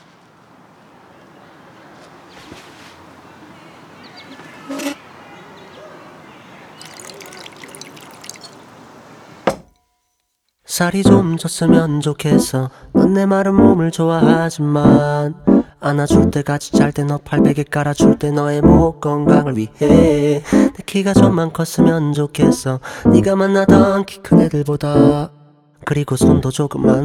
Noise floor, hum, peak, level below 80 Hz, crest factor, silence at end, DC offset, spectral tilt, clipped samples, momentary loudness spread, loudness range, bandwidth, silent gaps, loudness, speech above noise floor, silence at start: -69 dBFS; none; 0 dBFS; -36 dBFS; 16 dB; 0 s; under 0.1%; -6.5 dB/octave; under 0.1%; 22 LU; 19 LU; 16 kHz; none; -14 LUFS; 56 dB; 2.5 s